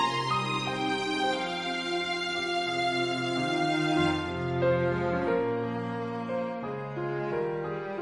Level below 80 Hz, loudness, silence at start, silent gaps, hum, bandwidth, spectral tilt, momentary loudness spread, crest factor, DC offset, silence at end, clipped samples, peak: -64 dBFS; -29 LUFS; 0 s; none; none; 11 kHz; -5.5 dB/octave; 7 LU; 14 dB; under 0.1%; 0 s; under 0.1%; -14 dBFS